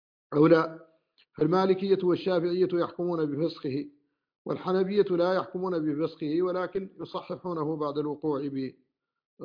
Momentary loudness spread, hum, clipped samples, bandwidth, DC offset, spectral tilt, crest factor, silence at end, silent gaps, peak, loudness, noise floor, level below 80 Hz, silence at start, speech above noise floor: 12 LU; none; under 0.1%; 5.2 kHz; under 0.1%; -9 dB/octave; 20 dB; 0 s; 4.38-4.45 s, 9.25-9.37 s; -8 dBFS; -28 LUFS; -66 dBFS; -70 dBFS; 0.3 s; 39 dB